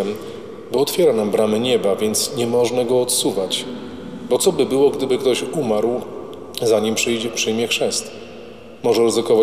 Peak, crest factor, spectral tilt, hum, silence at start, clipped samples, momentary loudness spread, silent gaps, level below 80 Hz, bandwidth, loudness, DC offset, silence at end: -4 dBFS; 14 dB; -3.5 dB/octave; none; 0 s; under 0.1%; 16 LU; none; -56 dBFS; 16 kHz; -18 LUFS; 0.5%; 0 s